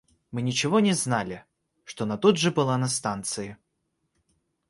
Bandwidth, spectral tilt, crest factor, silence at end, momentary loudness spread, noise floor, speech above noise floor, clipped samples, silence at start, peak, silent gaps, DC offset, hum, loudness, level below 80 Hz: 11.5 kHz; -4.5 dB/octave; 20 dB; 1.15 s; 15 LU; -77 dBFS; 52 dB; under 0.1%; 0.3 s; -6 dBFS; none; under 0.1%; none; -25 LUFS; -62 dBFS